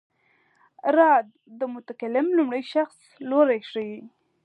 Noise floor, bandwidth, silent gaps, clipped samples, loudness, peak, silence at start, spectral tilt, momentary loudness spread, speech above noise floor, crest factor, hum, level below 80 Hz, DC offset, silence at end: -65 dBFS; 10.5 kHz; none; under 0.1%; -23 LUFS; -6 dBFS; 0.85 s; -6 dB/octave; 16 LU; 42 dB; 18 dB; none; -84 dBFS; under 0.1%; 0.35 s